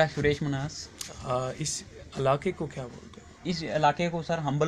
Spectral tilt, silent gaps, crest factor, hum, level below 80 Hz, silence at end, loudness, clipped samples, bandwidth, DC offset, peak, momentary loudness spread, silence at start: -5 dB/octave; none; 20 dB; none; -54 dBFS; 0 s; -30 LUFS; under 0.1%; 15 kHz; under 0.1%; -10 dBFS; 15 LU; 0 s